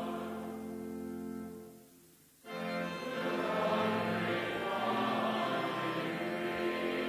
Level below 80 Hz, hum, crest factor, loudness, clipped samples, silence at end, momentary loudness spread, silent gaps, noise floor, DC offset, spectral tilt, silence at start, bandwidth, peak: -70 dBFS; none; 16 dB; -35 LUFS; under 0.1%; 0 s; 11 LU; none; -62 dBFS; under 0.1%; -5.5 dB/octave; 0 s; 16 kHz; -20 dBFS